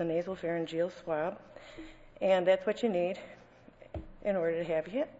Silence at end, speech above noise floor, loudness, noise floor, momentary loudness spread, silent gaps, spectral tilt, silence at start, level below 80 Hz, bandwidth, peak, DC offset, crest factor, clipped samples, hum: 0 s; 24 dB; -32 LUFS; -56 dBFS; 21 LU; none; -6.5 dB/octave; 0 s; -58 dBFS; 8 kHz; -16 dBFS; under 0.1%; 18 dB; under 0.1%; none